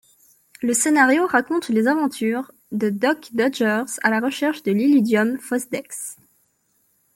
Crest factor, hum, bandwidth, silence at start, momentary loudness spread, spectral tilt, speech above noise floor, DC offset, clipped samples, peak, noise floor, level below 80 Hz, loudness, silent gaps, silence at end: 18 dB; none; 17 kHz; 0.6 s; 12 LU; -4 dB/octave; 46 dB; under 0.1%; under 0.1%; -2 dBFS; -66 dBFS; -70 dBFS; -20 LUFS; none; 1.05 s